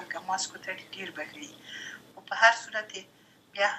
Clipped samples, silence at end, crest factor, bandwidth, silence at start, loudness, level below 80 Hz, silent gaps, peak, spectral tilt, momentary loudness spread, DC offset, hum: under 0.1%; 0 s; 26 dB; 14.5 kHz; 0 s; -29 LUFS; -80 dBFS; none; -6 dBFS; -0.5 dB/octave; 21 LU; under 0.1%; none